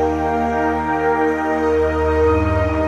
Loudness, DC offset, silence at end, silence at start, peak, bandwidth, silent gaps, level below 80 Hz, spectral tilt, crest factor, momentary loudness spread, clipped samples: -18 LUFS; under 0.1%; 0 s; 0 s; -6 dBFS; 9 kHz; none; -28 dBFS; -8 dB/octave; 12 dB; 3 LU; under 0.1%